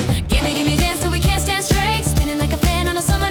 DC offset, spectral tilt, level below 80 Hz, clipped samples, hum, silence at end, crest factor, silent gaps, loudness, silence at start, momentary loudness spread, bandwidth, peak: under 0.1%; -4.5 dB/octave; -24 dBFS; under 0.1%; none; 0 s; 12 dB; none; -18 LUFS; 0 s; 2 LU; over 20 kHz; -6 dBFS